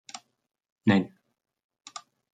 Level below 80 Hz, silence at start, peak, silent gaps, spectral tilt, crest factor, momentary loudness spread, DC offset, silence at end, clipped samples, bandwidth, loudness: -76 dBFS; 0.15 s; -8 dBFS; 0.72-0.76 s; -6 dB/octave; 24 dB; 21 LU; under 0.1%; 1.25 s; under 0.1%; 9.2 kHz; -26 LUFS